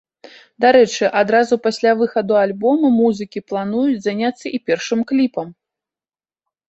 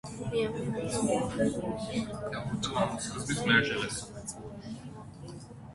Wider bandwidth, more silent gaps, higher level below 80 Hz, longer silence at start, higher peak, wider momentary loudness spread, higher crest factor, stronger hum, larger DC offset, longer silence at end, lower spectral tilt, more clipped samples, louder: second, 8.2 kHz vs 11.5 kHz; neither; second, -62 dBFS vs -56 dBFS; first, 0.6 s vs 0.05 s; first, -2 dBFS vs -10 dBFS; second, 10 LU vs 19 LU; second, 16 dB vs 24 dB; neither; neither; first, 1.15 s vs 0 s; about the same, -5 dB/octave vs -4.5 dB/octave; neither; first, -17 LUFS vs -31 LUFS